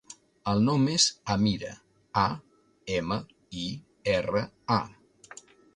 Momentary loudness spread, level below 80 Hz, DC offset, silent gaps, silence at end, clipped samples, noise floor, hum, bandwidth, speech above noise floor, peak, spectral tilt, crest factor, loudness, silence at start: 19 LU; -56 dBFS; under 0.1%; none; 0.85 s; under 0.1%; -51 dBFS; none; 11 kHz; 24 dB; -8 dBFS; -4.5 dB/octave; 20 dB; -28 LUFS; 0.1 s